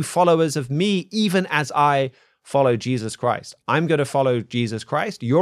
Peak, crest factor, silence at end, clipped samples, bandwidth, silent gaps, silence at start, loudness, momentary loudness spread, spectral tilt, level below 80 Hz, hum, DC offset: -4 dBFS; 16 dB; 0 s; under 0.1%; 14.5 kHz; none; 0 s; -21 LUFS; 7 LU; -5.5 dB/octave; -66 dBFS; none; under 0.1%